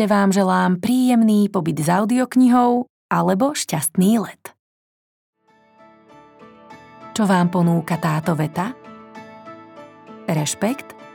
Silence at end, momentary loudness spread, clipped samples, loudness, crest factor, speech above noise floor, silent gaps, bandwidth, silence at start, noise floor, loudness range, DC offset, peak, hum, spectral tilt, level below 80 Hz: 0.05 s; 23 LU; under 0.1%; -18 LUFS; 16 dB; 36 dB; 2.89-3.09 s, 4.59-5.33 s; 19 kHz; 0 s; -54 dBFS; 8 LU; under 0.1%; -4 dBFS; none; -6 dB/octave; -66 dBFS